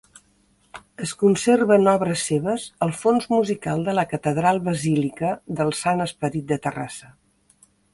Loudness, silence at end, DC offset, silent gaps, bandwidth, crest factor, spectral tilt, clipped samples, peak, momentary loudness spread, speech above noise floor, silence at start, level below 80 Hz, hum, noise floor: -22 LUFS; 0.85 s; under 0.1%; none; 11.5 kHz; 18 dB; -5.5 dB/octave; under 0.1%; -4 dBFS; 11 LU; 40 dB; 0.75 s; -58 dBFS; none; -61 dBFS